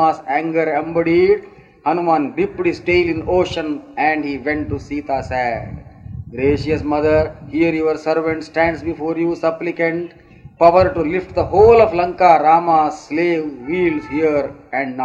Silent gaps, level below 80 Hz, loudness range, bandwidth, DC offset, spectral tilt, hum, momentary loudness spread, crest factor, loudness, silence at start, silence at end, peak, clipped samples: none; -40 dBFS; 6 LU; 7.8 kHz; under 0.1%; -7 dB/octave; none; 11 LU; 16 dB; -17 LUFS; 0 s; 0 s; 0 dBFS; under 0.1%